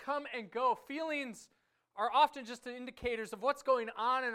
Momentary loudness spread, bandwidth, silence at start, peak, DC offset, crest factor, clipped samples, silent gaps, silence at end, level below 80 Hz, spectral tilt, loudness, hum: 15 LU; 15.5 kHz; 0 s; -16 dBFS; under 0.1%; 18 dB; under 0.1%; none; 0 s; -68 dBFS; -3.5 dB/octave; -35 LUFS; none